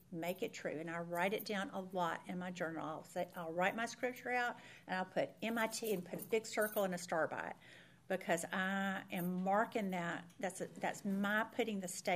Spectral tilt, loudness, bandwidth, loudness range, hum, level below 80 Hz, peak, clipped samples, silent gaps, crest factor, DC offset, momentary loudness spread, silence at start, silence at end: -4.5 dB/octave; -40 LUFS; 15.5 kHz; 2 LU; none; -82 dBFS; -20 dBFS; under 0.1%; none; 20 dB; under 0.1%; 7 LU; 0.1 s; 0 s